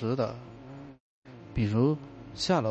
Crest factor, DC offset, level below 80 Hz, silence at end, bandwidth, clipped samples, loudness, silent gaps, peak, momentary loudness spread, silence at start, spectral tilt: 18 dB; under 0.1%; -50 dBFS; 0 s; 8.6 kHz; under 0.1%; -30 LUFS; 1.00-1.22 s; -12 dBFS; 21 LU; 0 s; -6.5 dB/octave